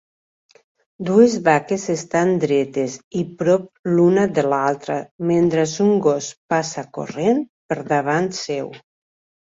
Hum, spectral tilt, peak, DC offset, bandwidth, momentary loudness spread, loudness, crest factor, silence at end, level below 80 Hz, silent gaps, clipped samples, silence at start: none; -6 dB/octave; -2 dBFS; under 0.1%; 7.8 kHz; 12 LU; -19 LUFS; 18 dB; 0.75 s; -60 dBFS; 3.04-3.11 s, 3.79-3.84 s, 5.11-5.19 s, 6.37-6.49 s, 7.49-7.69 s; under 0.1%; 1 s